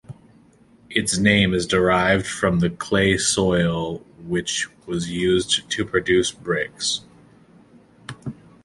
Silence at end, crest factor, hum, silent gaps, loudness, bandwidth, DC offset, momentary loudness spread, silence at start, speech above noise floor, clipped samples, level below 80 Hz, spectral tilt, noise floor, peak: 0.3 s; 20 dB; none; none; -21 LUFS; 11.5 kHz; under 0.1%; 13 LU; 0.1 s; 32 dB; under 0.1%; -44 dBFS; -4 dB/octave; -53 dBFS; -2 dBFS